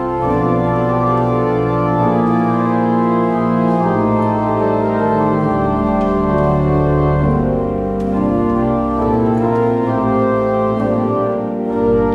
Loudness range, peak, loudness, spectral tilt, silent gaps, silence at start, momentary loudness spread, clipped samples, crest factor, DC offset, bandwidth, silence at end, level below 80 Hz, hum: 1 LU; -4 dBFS; -15 LUFS; -10 dB/octave; none; 0 s; 2 LU; under 0.1%; 10 dB; under 0.1%; 6.2 kHz; 0 s; -32 dBFS; none